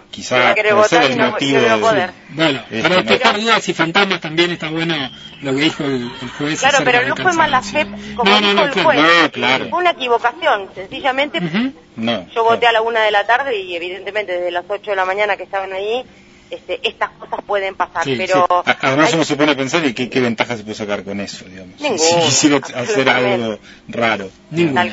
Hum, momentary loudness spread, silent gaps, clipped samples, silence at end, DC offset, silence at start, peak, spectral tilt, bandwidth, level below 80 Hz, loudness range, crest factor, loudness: none; 12 LU; none; under 0.1%; 0 s; under 0.1%; 0.15 s; 0 dBFS; -3.5 dB/octave; 8 kHz; -52 dBFS; 6 LU; 16 dB; -15 LUFS